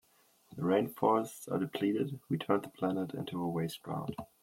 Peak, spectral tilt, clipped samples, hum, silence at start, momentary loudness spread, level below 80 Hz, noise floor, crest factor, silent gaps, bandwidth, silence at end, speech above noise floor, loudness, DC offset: -14 dBFS; -6.5 dB/octave; under 0.1%; none; 0.5 s; 9 LU; -72 dBFS; -68 dBFS; 20 dB; none; 16.5 kHz; 0.2 s; 34 dB; -34 LUFS; under 0.1%